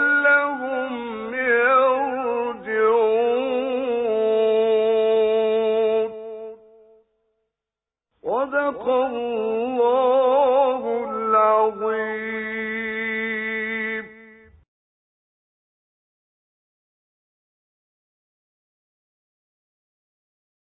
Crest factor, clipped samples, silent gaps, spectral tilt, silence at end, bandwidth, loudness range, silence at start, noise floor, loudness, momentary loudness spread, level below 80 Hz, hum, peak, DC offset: 16 dB; under 0.1%; none; -8.5 dB/octave; 6.55 s; 4 kHz; 8 LU; 0 s; -89 dBFS; -21 LUFS; 10 LU; -66 dBFS; none; -6 dBFS; under 0.1%